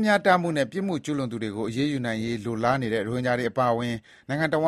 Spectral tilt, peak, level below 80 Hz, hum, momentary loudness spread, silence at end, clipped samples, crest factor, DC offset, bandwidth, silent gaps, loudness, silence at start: -6 dB/octave; -6 dBFS; -60 dBFS; none; 8 LU; 0 s; under 0.1%; 18 dB; under 0.1%; 13.5 kHz; none; -26 LUFS; 0 s